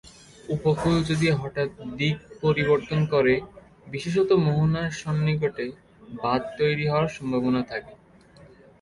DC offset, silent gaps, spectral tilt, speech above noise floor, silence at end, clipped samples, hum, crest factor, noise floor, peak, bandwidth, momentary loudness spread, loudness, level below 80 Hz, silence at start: under 0.1%; none; -7 dB/octave; 28 dB; 0.85 s; under 0.1%; none; 16 dB; -52 dBFS; -10 dBFS; 11.5 kHz; 12 LU; -25 LUFS; -50 dBFS; 0.05 s